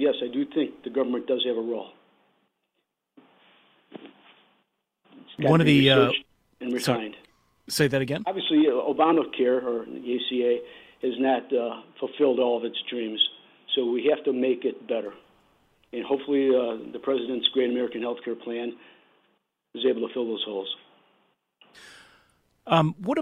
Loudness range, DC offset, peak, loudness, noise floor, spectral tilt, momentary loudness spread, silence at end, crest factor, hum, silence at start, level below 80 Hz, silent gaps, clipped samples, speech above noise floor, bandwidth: 9 LU; under 0.1%; -4 dBFS; -25 LUFS; -79 dBFS; -5.5 dB/octave; 13 LU; 0 s; 22 dB; none; 0 s; -66 dBFS; none; under 0.1%; 54 dB; 16 kHz